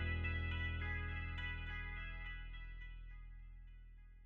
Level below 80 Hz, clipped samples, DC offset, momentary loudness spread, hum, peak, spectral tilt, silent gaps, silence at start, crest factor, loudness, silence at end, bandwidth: -48 dBFS; under 0.1%; under 0.1%; 19 LU; none; -30 dBFS; -4 dB/octave; none; 0 s; 16 dB; -45 LUFS; 0 s; 4.7 kHz